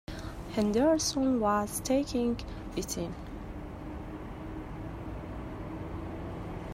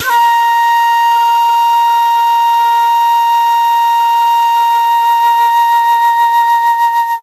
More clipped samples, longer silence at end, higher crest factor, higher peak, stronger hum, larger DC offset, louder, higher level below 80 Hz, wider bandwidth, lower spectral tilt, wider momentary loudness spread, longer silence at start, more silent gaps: neither; about the same, 0 s vs 0 s; first, 16 dB vs 8 dB; second, -16 dBFS vs -2 dBFS; neither; neither; second, -33 LUFS vs -10 LUFS; first, -46 dBFS vs -68 dBFS; first, 16 kHz vs 14.5 kHz; first, -5 dB/octave vs 2 dB/octave; first, 15 LU vs 1 LU; about the same, 0.1 s vs 0 s; neither